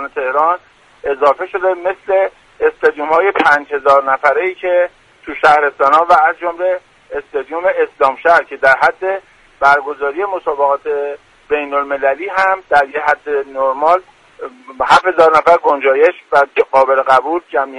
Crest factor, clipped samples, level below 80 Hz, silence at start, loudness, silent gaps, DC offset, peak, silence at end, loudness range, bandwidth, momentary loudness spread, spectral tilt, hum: 14 dB; under 0.1%; -52 dBFS; 0 s; -13 LUFS; none; under 0.1%; 0 dBFS; 0 s; 4 LU; 11 kHz; 11 LU; -4 dB/octave; none